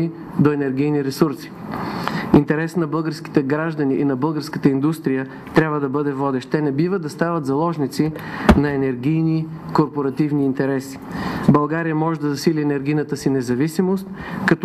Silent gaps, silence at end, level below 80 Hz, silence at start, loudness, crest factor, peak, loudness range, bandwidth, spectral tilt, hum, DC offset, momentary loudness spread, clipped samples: none; 0 s; -40 dBFS; 0 s; -20 LUFS; 16 dB; -4 dBFS; 1 LU; 13.5 kHz; -7.5 dB/octave; none; under 0.1%; 7 LU; under 0.1%